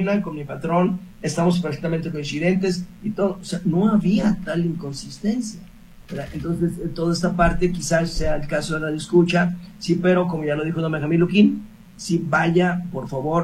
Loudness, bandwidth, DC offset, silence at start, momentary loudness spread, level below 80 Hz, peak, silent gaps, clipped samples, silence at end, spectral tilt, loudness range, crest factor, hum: -22 LUFS; 12.5 kHz; under 0.1%; 0 s; 11 LU; -38 dBFS; -4 dBFS; none; under 0.1%; 0 s; -6.5 dB/octave; 4 LU; 18 dB; none